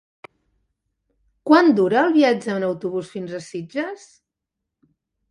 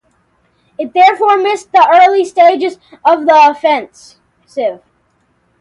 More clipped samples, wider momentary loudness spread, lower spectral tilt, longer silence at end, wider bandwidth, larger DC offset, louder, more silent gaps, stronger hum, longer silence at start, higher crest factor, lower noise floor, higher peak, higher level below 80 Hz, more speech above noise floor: neither; first, 17 LU vs 12 LU; first, -6 dB/octave vs -3 dB/octave; first, 1.35 s vs 0.85 s; about the same, 11 kHz vs 11 kHz; neither; second, -19 LUFS vs -10 LUFS; neither; neither; first, 1.45 s vs 0.8 s; first, 22 dB vs 12 dB; first, -83 dBFS vs -58 dBFS; about the same, 0 dBFS vs 0 dBFS; about the same, -68 dBFS vs -64 dBFS; first, 64 dB vs 48 dB